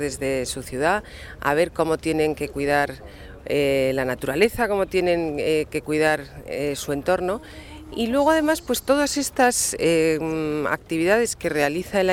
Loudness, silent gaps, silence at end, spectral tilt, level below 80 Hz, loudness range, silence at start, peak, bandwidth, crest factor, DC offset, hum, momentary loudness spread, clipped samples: -22 LUFS; none; 0 s; -4 dB/octave; -46 dBFS; 3 LU; 0 s; -6 dBFS; 17.5 kHz; 16 dB; under 0.1%; none; 9 LU; under 0.1%